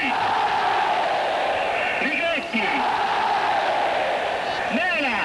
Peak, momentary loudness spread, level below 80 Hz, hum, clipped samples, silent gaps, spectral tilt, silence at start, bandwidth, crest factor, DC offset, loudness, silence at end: -12 dBFS; 2 LU; -56 dBFS; none; under 0.1%; none; -3.5 dB/octave; 0 s; 11 kHz; 10 dB; under 0.1%; -22 LUFS; 0 s